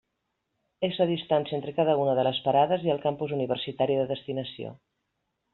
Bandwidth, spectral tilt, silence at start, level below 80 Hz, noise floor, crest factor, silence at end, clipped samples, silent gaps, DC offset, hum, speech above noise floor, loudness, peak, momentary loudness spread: 4.3 kHz; -4.5 dB/octave; 0.8 s; -68 dBFS; -80 dBFS; 18 dB; 0.8 s; under 0.1%; none; under 0.1%; none; 54 dB; -27 LUFS; -10 dBFS; 10 LU